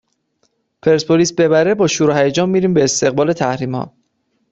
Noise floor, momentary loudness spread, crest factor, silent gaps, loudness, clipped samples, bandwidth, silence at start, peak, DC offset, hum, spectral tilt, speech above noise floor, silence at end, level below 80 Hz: -66 dBFS; 8 LU; 14 dB; none; -15 LUFS; under 0.1%; 8.4 kHz; 0.85 s; -2 dBFS; under 0.1%; none; -5 dB/octave; 52 dB; 0.65 s; -54 dBFS